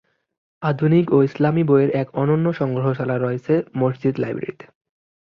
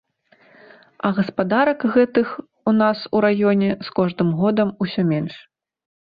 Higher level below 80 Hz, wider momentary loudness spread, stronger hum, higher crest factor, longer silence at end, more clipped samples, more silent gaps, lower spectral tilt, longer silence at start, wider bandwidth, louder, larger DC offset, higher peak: about the same, -60 dBFS vs -60 dBFS; about the same, 9 LU vs 7 LU; neither; about the same, 16 dB vs 16 dB; about the same, 0.7 s vs 0.75 s; neither; neither; about the same, -10.5 dB/octave vs -10 dB/octave; second, 0.6 s vs 1.05 s; first, 6 kHz vs 5 kHz; about the same, -20 LUFS vs -20 LUFS; neither; about the same, -4 dBFS vs -4 dBFS